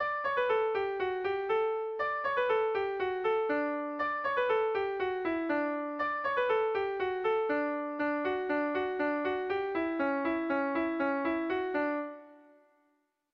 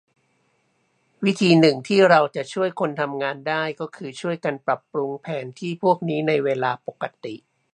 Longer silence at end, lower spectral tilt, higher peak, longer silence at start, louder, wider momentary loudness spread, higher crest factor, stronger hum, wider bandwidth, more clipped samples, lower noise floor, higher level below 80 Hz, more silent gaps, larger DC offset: first, 0.95 s vs 0.35 s; about the same, -6.5 dB/octave vs -6 dB/octave; second, -18 dBFS vs 0 dBFS; second, 0 s vs 1.2 s; second, -31 LUFS vs -22 LUFS; second, 4 LU vs 16 LU; second, 12 dB vs 22 dB; neither; second, 6.2 kHz vs 10.5 kHz; neither; first, -75 dBFS vs -67 dBFS; first, -68 dBFS vs -74 dBFS; neither; neither